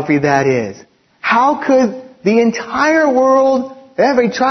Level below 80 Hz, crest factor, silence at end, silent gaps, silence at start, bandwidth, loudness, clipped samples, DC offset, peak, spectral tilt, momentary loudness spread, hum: -56 dBFS; 14 dB; 0 s; none; 0 s; 6.4 kHz; -13 LUFS; under 0.1%; under 0.1%; 0 dBFS; -5.5 dB/octave; 8 LU; none